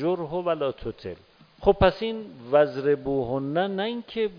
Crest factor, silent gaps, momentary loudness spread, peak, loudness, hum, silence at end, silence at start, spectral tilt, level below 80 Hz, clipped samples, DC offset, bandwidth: 20 dB; none; 14 LU; -6 dBFS; -25 LUFS; none; 0 s; 0 s; -8.5 dB/octave; -44 dBFS; under 0.1%; under 0.1%; 5.2 kHz